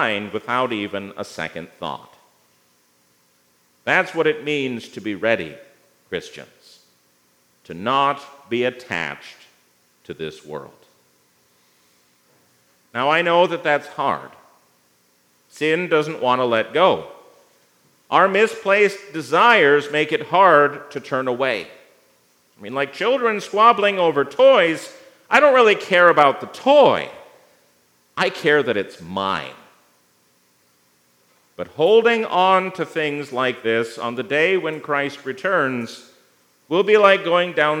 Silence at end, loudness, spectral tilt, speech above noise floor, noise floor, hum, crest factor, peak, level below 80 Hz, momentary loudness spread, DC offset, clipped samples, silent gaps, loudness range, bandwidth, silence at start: 0 s; -18 LUFS; -4.5 dB/octave; 42 dB; -60 dBFS; 60 Hz at -60 dBFS; 20 dB; 0 dBFS; -72 dBFS; 17 LU; under 0.1%; under 0.1%; none; 12 LU; 15.5 kHz; 0 s